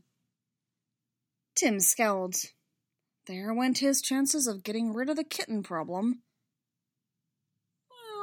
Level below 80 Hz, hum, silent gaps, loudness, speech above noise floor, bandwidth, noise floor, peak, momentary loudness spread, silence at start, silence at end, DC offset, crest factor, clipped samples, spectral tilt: -82 dBFS; none; none; -28 LUFS; 58 dB; 16.5 kHz; -87 dBFS; -10 dBFS; 13 LU; 1.55 s; 0 s; under 0.1%; 22 dB; under 0.1%; -2.5 dB/octave